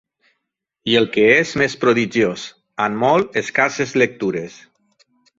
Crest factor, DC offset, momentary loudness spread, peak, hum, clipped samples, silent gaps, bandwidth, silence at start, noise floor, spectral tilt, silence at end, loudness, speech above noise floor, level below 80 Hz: 18 dB; under 0.1%; 14 LU; 0 dBFS; none; under 0.1%; none; 7.8 kHz; 0.85 s; -77 dBFS; -4.5 dB/octave; 0.9 s; -17 LUFS; 60 dB; -58 dBFS